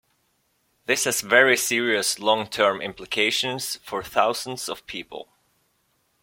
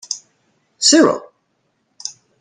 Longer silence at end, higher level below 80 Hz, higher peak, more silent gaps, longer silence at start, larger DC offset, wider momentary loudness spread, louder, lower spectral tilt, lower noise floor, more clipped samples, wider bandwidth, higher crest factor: first, 1 s vs 0.3 s; about the same, -64 dBFS vs -66 dBFS; about the same, -2 dBFS vs 0 dBFS; neither; first, 0.9 s vs 0.1 s; neither; second, 16 LU vs 20 LU; second, -22 LUFS vs -14 LUFS; about the same, -1.5 dB/octave vs -1.5 dB/octave; about the same, -69 dBFS vs -67 dBFS; neither; first, 16.5 kHz vs 10 kHz; about the same, 22 dB vs 18 dB